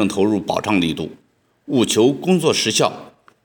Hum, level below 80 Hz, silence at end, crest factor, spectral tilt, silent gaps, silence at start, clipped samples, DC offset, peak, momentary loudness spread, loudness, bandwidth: none; -58 dBFS; 0.35 s; 18 dB; -4.5 dB/octave; none; 0 s; under 0.1%; under 0.1%; -2 dBFS; 9 LU; -18 LUFS; over 20 kHz